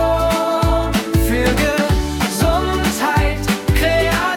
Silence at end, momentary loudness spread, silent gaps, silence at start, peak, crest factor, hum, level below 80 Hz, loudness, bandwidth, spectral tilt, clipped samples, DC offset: 0 s; 3 LU; none; 0 s; -2 dBFS; 14 dB; none; -24 dBFS; -17 LUFS; 18 kHz; -5 dB/octave; under 0.1%; under 0.1%